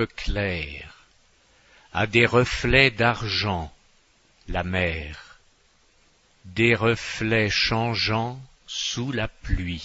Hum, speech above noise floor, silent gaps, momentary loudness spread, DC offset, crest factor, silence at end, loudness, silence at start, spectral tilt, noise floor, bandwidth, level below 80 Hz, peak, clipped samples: none; 37 dB; none; 15 LU; under 0.1%; 22 dB; 0 s; -23 LUFS; 0 s; -5 dB/octave; -61 dBFS; 8 kHz; -38 dBFS; -4 dBFS; under 0.1%